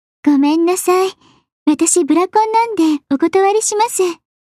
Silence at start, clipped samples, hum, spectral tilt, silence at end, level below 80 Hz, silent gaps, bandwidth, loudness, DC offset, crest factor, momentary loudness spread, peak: 0.25 s; under 0.1%; none; -2 dB/octave; 0.35 s; -66 dBFS; 1.52-1.66 s; 14 kHz; -14 LUFS; under 0.1%; 14 dB; 5 LU; -2 dBFS